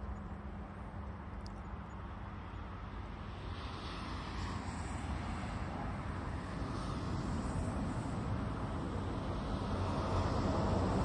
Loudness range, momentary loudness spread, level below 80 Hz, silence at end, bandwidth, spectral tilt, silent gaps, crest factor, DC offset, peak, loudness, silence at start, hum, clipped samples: 8 LU; 11 LU; -46 dBFS; 0 s; 10.5 kHz; -7 dB/octave; none; 16 dB; under 0.1%; -22 dBFS; -41 LUFS; 0 s; none; under 0.1%